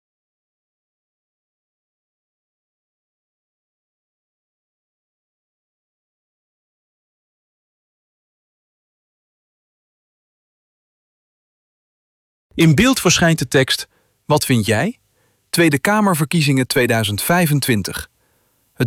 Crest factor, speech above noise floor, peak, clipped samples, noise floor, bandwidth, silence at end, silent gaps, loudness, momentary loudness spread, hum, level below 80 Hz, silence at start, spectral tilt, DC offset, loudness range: 18 dB; 47 dB; -4 dBFS; under 0.1%; -62 dBFS; 17 kHz; 0 s; none; -16 LUFS; 9 LU; none; -50 dBFS; 12.55 s; -4.5 dB/octave; under 0.1%; 2 LU